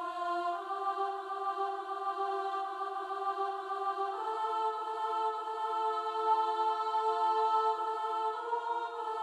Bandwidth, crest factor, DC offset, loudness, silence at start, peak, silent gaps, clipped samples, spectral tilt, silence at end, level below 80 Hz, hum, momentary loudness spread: 11.5 kHz; 16 dB; under 0.1%; -34 LUFS; 0 s; -18 dBFS; none; under 0.1%; -2 dB/octave; 0 s; -82 dBFS; none; 6 LU